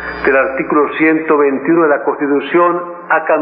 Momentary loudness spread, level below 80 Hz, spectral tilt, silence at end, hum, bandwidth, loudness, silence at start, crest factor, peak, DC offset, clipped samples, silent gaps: 4 LU; -48 dBFS; -10.5 dB/octave; 0 s; none; 5 kHz; -13 LUFS; 0 s; 12 dB; 0 dBFS; under 0.1%; under 0.1%; none